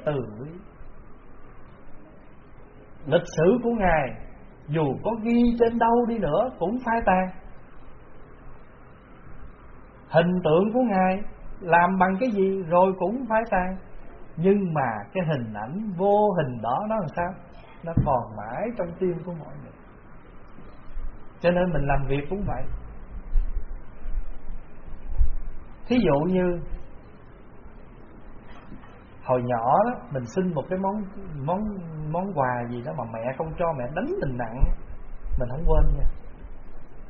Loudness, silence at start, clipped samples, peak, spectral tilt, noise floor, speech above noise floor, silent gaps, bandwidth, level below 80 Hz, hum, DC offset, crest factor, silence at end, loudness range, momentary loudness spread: -25 LUFS; 0 s; under 0.1%; -6 dBFS; -6.5 dB/octave; -47 dBFS; 23 dB; none; 4.5 kHz; -34 dBFS; none; under 0.1%; 20 dB; 0 s; 8 LU; 22 LU